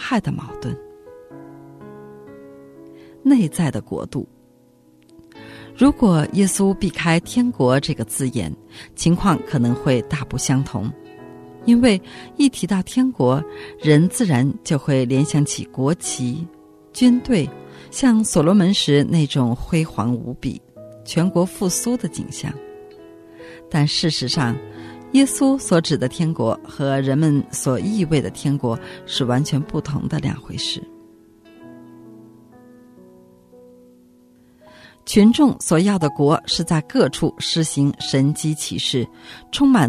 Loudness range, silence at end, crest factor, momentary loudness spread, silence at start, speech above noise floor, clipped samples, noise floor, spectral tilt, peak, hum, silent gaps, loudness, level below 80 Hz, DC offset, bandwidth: 6 LU; 0 s; 18 dB; 18 LU; 0 s; 35 dB; under 0.1%; -53 dBFS; -5.5 dB/octave; -2 dBFS; none; none; -19 LUFS; -46 dBFS; under 0.1%; 13.5 kHz